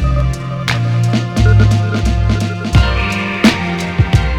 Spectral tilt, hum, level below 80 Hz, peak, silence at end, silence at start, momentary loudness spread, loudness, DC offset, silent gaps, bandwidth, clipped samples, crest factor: -6 dB/octave; none; -20 dBFS; 0 dBFS; 0 s; 0 s; 6 LU; -14 LUFS; under 0.1%; none; 12.5 kHz; under 0.1%; 12 dB